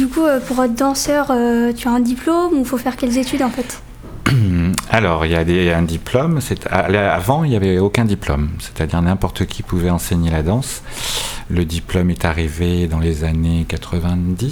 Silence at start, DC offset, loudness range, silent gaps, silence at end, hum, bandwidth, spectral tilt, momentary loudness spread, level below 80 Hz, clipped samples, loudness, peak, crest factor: 0 s; under 0.1%; 3 LU; none; 0 s; none; over 20 kHz; -6 dB/octave; 6 LU; -30 dBFS; under 0.1%; -17 LUFS; 0 dBFS; 16 dB